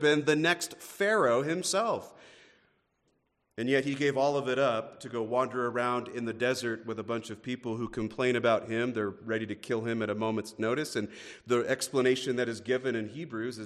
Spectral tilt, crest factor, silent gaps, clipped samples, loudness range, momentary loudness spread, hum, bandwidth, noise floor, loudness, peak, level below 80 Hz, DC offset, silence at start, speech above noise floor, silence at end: -4.5 dB/octave; 18 dB; none; under 0.1%; 2 LU; 10 LU; none; 14 kHz; -75 dBFS; -30 LUFS; -12 dBFS; -70 dBFS; under 0.1%; 0 s; 45 dB; 0 s